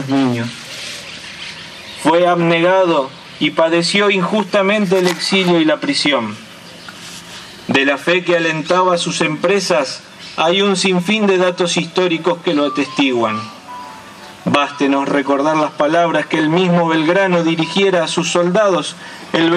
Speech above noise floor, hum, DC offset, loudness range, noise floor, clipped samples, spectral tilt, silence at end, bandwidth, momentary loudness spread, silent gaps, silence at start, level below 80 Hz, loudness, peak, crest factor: 21 dB; none; under 0.1%; 3 LU; -35 dBFS; under 0.1%; -4.5 dB/octave; 0 s; 14 kHz; 17 LU; none; 0 s; -62 dBFS; -15 LUFS; 0 dBFS; 16 dB